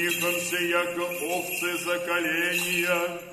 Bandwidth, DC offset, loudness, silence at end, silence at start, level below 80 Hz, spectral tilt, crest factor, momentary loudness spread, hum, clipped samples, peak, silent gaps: 13.5 kHz; under 0.1%; -26 LUFS; 0 s; 0 s; -68 dBFS; -2.5 dB/octave; 16 dB; 4 LU; none; under 0.1%; -12 dBFS; none